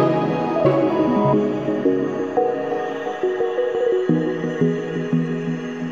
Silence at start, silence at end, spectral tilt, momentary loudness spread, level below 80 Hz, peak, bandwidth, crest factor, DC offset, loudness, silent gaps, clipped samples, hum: 0 s; 0 s; -8 dB/octave; 7 LU; -58 dBFS; -4 dBFS; 7.4 kHz; 16 dB; 0.2%; -21 LUFS; none; under 0.1%; none